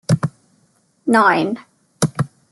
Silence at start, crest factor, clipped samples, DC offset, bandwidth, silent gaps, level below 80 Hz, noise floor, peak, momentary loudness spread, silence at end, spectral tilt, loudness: 0.1 s; 18 dB; under 0.1%; under 0.1%; 12 kHz; none; -58 dBFS; -60 dBFS; -2 dBFS; 14 LU; 0.25 s; -5.5 dB/octave; -18 LUFS